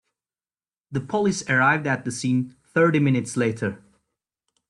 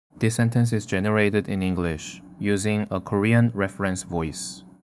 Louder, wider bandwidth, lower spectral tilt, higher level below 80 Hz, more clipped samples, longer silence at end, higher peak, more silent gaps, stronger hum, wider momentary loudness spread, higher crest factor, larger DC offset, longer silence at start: about the same, -23 LUFS vs -24 LUFS; about the same, 12 kHz vs 12 kHz; about the same, -6 dB/octave vs -6 dB/octave; second, -64 dBFS vs -54 dBFS; neither; first, 0.9 s vs 0.2 s; about the same, -6 dBFS vs -6 dBFS; neither; neither; about the same, 11 LU vs 11 LU; about the same, 18 dB vs 18 dB; neither; first, 0.9 s vs 0.15 s